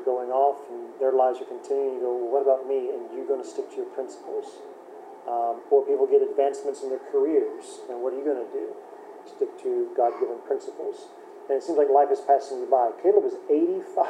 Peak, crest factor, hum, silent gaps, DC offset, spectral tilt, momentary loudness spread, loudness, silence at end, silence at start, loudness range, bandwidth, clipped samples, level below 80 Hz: -6 dBFS; 18 dB; none; none; under 0.1%; -5 dB/octave; 17 LU; -25 LUFS; 0 s; 0 s; 5 LU; 9.6 kHz; under 0.1%; under -90 dBFS